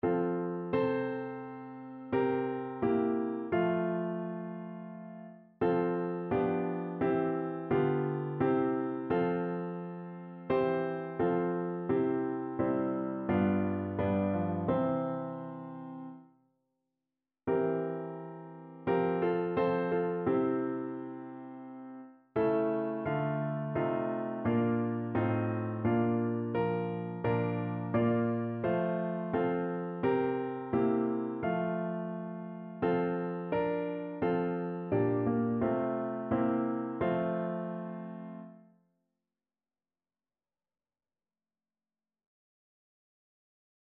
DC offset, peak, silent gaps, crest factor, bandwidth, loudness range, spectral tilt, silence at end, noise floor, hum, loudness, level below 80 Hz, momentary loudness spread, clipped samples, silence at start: under 0.1%; -16 dBFS; none; 16 dB; 4.5 kHz; 4 LU; -7.5 dB/octave; 5.35 s; under -90 dBFS; none; -32 LUFS; -66 dBFS; 13 LU; under 0.1%; 0.05 s